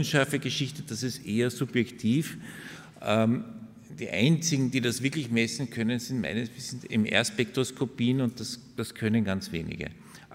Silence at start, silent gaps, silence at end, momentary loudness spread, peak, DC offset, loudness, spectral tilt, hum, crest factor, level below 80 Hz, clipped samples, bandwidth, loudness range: 0 s; none; 0 s; 13 LU; -6 dBFS; under 0.1%; -29 LUFS; -5 dB/octave; none; 22 dB; -60 dBFS; under 0.1%; 16 kHz; 2 LU